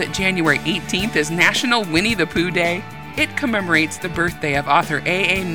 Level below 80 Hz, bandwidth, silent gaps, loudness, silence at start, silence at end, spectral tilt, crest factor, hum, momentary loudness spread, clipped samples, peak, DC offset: -44 dBFS; over 20 kHz; none; -18 LUFS; 0 s; 0 s; -4 dB/octave; 18 dB; none; 6 LU; under 0.1%; -2 dBFS; 0.7%